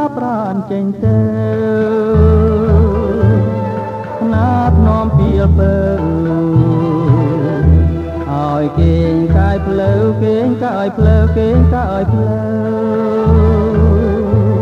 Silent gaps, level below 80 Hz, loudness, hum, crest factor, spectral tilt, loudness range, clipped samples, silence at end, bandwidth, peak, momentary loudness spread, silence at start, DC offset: none; -20 dBFS; -13 LUFS; none; 12 dB; -10 dB/octave; 1 LU; under 0.1%; 0 s; 5.4 kHz; 0 dBFS; 6 LU; 0 s; under 0.1%